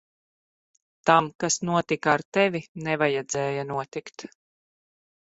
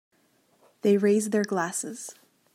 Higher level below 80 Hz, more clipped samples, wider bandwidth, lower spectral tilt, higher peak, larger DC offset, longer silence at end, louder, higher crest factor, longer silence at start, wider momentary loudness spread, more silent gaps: first, -66 dBFS vs -80 dBFS; neither; second, 8.2 kHz vs 15.5 kHz; about the same, -4 dB/octave vs -5 dB/octave; first, -2 dBFS vs -12 dBFS; neither; first, 1.15 s vs 0.45 s; about the same, -25 LUFS vs -25 LUFS; first, 24 dB vs 16 dB; first, 1.05 s vs 0.85 s; about the same, 15 LU vs 16 LU; first, 1.35-1.39 s, 2.25-2.32 s, 2.68-2.75 s vs none